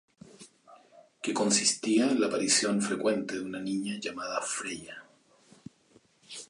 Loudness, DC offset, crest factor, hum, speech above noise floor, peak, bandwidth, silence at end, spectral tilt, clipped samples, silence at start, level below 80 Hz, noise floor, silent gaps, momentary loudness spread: -28 LUFS; under 0.1%; 22 dB; none; 35 dB; -10 dBFS; 11.5 kHz; 0.05 s; -2.5 dB/octave; under 0.1%; 0.4 s; -74 dBFS; -64 dBFS; none; 13 LU